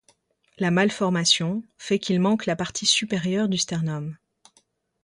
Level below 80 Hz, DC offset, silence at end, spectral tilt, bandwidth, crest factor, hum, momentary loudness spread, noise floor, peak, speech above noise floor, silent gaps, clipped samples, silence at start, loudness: -64 dBFS; under 0.1%; 0.9 s; -4 dB/octave; 11.5 kHz; 20 dB; none; 9 LU; -65 dBFS; -4 dBFS; 42 dB; none; under 0.1%; 0.6 s; -23 LUFS